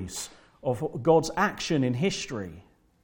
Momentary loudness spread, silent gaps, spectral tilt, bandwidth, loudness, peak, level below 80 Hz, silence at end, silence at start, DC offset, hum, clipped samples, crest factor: 14 LU; none; -5 dB/octave; 18 kHz; -27 LUFS; -8 dBFS; -56 dBFS; 0.45 s; 0 s; under 0.1%; none; under 0.1%; 20 dB